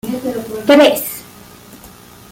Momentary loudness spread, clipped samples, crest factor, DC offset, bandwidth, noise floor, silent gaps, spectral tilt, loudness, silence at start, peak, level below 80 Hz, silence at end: 15 LU; under 0.1%; 16 dB; under 0.1%; 17 kHz; -39 dBFS; none; -3.5 dB/octave; -13 LUFS; 0.05 s; -2 dBFS; -52 dBFS; 0.45 s